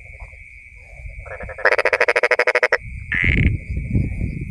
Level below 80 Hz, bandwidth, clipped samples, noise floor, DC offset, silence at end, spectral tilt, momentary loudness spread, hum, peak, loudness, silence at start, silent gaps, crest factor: -30 dBFS; 11 kHz; under 0.1%; -41 dBFS; under 0.1%; 0 s; -6 dB/octave; 23 LU; none; 0 dBFS; -18 LUFS; 0 s; none; 20 dB